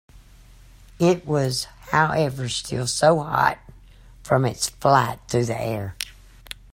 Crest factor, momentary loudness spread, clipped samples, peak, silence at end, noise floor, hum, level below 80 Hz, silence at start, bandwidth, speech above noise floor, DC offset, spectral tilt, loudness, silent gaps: 22 dB; 13 LU; under 0.1%; -2 dBFS; 0.2 s; -48 dBFS; none; -48 dBFS; 0.15 s; 16 kHz; 27 dB; under 0.1%; -4.5 dB/octave; -22 LUFS; none